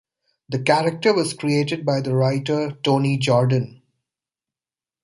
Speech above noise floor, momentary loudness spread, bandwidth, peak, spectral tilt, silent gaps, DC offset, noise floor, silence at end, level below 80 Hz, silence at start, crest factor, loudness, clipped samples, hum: over 70 dB; 6 LU; 11.5 kHz; -2 dBFS; -6 dB/octave; none; under 0.1%; under -90 dBFS; 1.35 s; -62 dBFS; 0.5 s; 20 dB; -20 LUFS; under 0.1%; none